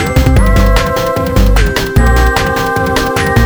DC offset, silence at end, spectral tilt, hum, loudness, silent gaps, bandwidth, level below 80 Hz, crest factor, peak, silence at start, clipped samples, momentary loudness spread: under 0.1%; 0 s; -5.5 dB/octave; none; -11 LUFS; none; over 20 kHz; -12 dBFS; 10 dB; 0 dBFS; 0 s; 0.2%; 3 LU